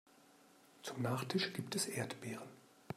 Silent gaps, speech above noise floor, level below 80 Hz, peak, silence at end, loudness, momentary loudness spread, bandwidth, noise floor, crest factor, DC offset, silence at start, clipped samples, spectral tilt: none; 25 dB; -80 dBFS; -24 dBFS; 0 s; -41 LUFS; 12 LU; 16 kHz; -66 dBFS; 18 dB; under 0.1%; 0.75 s; under 0.1%; -4 dB/octave